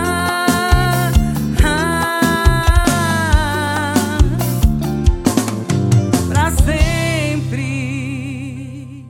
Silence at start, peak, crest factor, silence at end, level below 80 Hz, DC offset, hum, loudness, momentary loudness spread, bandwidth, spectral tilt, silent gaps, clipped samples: 0 s; 0 dBFS; 14 dB; 0 s; -20 dBFS; under 0.1%; none; -16 LUFS; 8 LU; 17 kHz; -5.5 dB/octave; none; under 0.1%